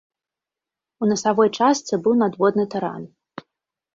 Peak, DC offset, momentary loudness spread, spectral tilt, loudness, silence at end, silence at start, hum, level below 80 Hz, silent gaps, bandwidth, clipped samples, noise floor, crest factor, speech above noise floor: -4 dBFS; under 0.1%; 22 LU; -5 dB/octave; -20 LUFS; 0.9 s; 1 s; none; -66 dBFS; none; 7.8 kHz; under 0.1%; -88 dBFS; 18 dB; 69 dB